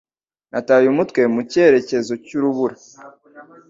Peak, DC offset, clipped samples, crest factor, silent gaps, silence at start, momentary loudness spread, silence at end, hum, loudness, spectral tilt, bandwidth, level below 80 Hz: -2 dBFS; under 0.1%; under 0.1%; 16 dB; none; 0.55 s; 11 LU; 0.25 s; none; -17 LUFS; -6 dB/octave; 7.8 kHz; -62 dBFS